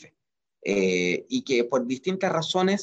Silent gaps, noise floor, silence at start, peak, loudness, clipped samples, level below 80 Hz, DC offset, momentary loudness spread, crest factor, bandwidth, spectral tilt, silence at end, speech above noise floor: none; -83 dBFS; 0.65 s; -12 dBFS; -25 LUFS; under 0.1%; -68 dBFS; under 0.1%; 5 LU; 14 dB; 8.4 kHz; -4.5 dB/octave; 0 s; 58 dB